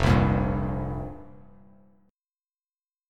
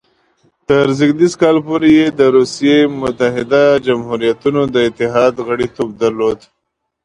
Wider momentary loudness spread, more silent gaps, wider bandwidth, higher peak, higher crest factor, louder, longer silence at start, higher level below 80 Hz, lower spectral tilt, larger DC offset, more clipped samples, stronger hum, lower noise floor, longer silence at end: first, 18 LU vs 7 LU; neither; about the same, 10 kHz vs 10.5 kHz; second, -8 dBFS vs 0 dBFS; first, 20 dB vs 14 dB; second, -26 LUFS vs -13 LUFS; second, 0 s vs 0.7 s; first, -36 dBFS vs -48 dBFS; first, -7.5 dB/octave vs -6 dB/octave; neither; neither; neither; first, under -90 dBFS vs -72 dBFS; first, 1.75 s vs 0.7 s